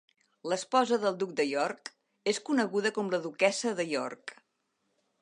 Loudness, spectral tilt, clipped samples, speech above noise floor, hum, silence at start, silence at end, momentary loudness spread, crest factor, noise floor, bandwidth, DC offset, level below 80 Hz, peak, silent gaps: -30 LUFS; -3.5 dB/octave; under 0.1%; 49 dB; none; 0.45 s; 0.9 s; 15 LU; 20 dB; -79 dBFS; 11.5 kHz; under 0.1%; -84 dBFS; -10 dBFS; none